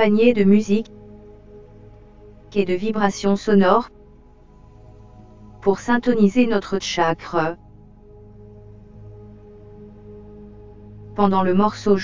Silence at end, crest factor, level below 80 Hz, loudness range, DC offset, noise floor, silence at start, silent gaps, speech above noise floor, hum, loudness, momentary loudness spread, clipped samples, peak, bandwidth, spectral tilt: 0 s; 20 dB; -48 dBFS; 7 LU; under 0.1%; -47 dBFS; 0 s; none; 30 dB; none; -19 LUFS; 26 LU; under 0.1%; 0 dBFS; 7.6 kHz; -6.5 dB/octave